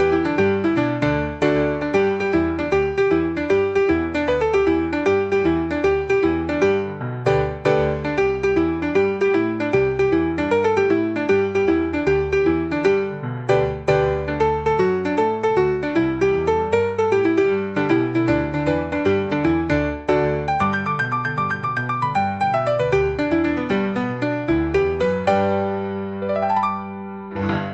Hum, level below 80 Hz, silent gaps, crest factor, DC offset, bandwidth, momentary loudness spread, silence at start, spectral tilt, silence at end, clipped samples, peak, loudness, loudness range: none; -40 dBFS; none; 14 dB; 0.2%; 8 kHz; 4 LU; 0 s; -7.5 dB/octave; 0 s; under 0.1%; -4 dBFS; -20 LUFS; 2 LU